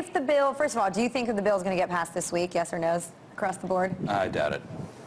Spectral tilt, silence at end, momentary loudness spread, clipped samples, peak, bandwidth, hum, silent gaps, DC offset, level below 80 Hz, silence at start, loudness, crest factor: -5 dB/octave; 0 s; 7 LU; under 0.1%; -14 dBFS; 14 kHz; none; none; under 0.1%; -60 dBFS; 0 s; -28 LUFS; 14 dB